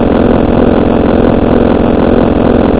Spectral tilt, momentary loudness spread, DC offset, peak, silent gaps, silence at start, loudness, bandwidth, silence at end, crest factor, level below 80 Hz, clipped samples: -12 dB/octave; 0 LU; 2%; 0 dBFS; none; 0 s; -8 LUFS; 4 kHz; 0 s; 8 dB; -18 dBFS; 2%